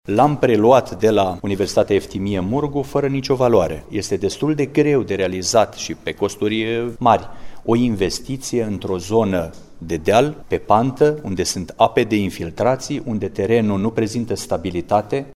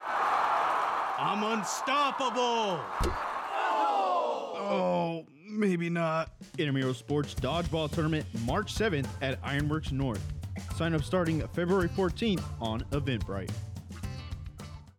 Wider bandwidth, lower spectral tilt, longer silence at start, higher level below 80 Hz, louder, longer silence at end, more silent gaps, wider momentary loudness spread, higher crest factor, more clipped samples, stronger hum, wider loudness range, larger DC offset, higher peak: second, 14.5 kHz vs 16.5 kHz; about the same, -5.5 dB/octave vs -5.5 dB/octave; about the same, 0.05 s vs 0 s; about the same, -44 dBFS vs -46 dBFS; first, -19 LUFS vs -31 LUFS; about the same, 0.05 s vs 0.1 s; neither; about the same, 9 LU vs 11 LU; first, 18 dB vs 12 dB; neither; neither; about the same, 2 LU vs 2 LU; neither; first, 0 dBFS vs -18 dBFS